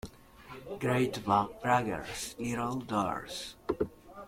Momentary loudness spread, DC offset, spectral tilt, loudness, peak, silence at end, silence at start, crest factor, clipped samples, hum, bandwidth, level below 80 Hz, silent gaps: 13 LU; under 0.1%; -5 dB/octave; -33 LUFS; -12 dBFS; 0 s; 0.05 s; 20 dB; under 0.1%; none; 16.5 kHz; -58 dBFS; none